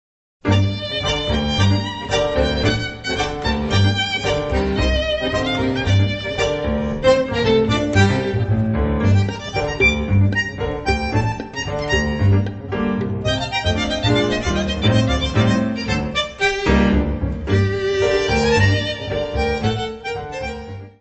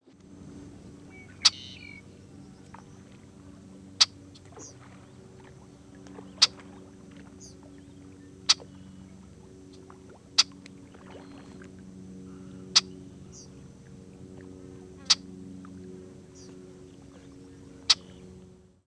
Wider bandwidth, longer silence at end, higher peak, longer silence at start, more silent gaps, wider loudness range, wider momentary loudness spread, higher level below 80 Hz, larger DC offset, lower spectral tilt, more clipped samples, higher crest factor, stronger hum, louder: second, 8.4 kHz vs 11 kHz; about the same, 0.1 s vs 0.2 s; about the same, -2 dBFS vs -4 dBFS; first, 0.45 s vs 0.05 s; neither; about the same, 2 LU vs 4 LU; second, 7 LU vs 27 LU; first, -30 dBFS vs -62 dBFS; neither; first, -5.5 dB/octave vs -0.5 dB/octave; neither; second, 16 dB vs 32 dB; neither; first, -19 LUFS vs -24 LUFS